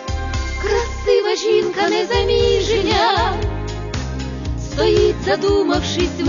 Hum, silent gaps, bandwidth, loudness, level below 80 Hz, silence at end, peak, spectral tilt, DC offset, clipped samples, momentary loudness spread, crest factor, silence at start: none; none; 7.4 kHz; -18 LUFS; -28 dBFS; 0 s; -4 dBFS; -5 dB/octave; under 0.1%; under 0.1%; 10 LU; 14 dB; 0 s